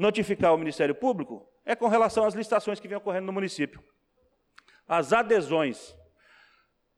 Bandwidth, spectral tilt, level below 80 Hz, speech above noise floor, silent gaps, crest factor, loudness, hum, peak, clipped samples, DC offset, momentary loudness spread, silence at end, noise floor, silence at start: 12 kHz; -5.5 dB/octave; -64 dBFS; 44 dB; none; 16 dB; -26 LUFS; none; -12 dBFS; under 0.1%; under 0.1%; 10 LU; 1.05 s; -70 dBFS; 0 s